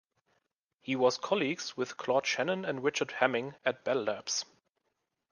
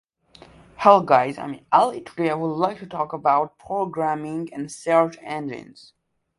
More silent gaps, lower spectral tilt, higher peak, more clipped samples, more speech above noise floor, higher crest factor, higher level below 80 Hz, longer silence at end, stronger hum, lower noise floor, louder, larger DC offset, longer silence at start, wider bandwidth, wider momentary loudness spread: neither; second, -3 dB/octave vs -6 dB/octave; second, -10 dBFS vs 0 dBFS; neither; first, 51 dB vs 29 dB; about the same, 24 dB vs 22 dB; second, -82 dBFS vs -64 dBFS; first, 0.9 s vs 0.75 s; neither; first, -82 dBFS vs -51 dBFS; second, -32 LUFS vs -22 LUFS; neither; about the same, 0.85 s vs 0.8 s; about the same, 10.5 kHz vs 11.5 kHz; second, 7 LU vs 14 LU